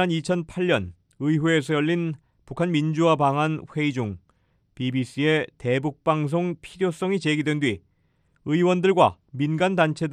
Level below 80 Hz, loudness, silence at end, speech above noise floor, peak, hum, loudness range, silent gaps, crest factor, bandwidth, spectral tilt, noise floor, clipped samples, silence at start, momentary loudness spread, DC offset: -60 dBFS; -24 LUFS; 0 s; 43 dB; -4 dBFS; none; 3 LU; none; 20 dB; 11 kHz; -6.5 dB/octave; -66 dBFS; under 0.1%; 0 s; 10 LU; under 0.1%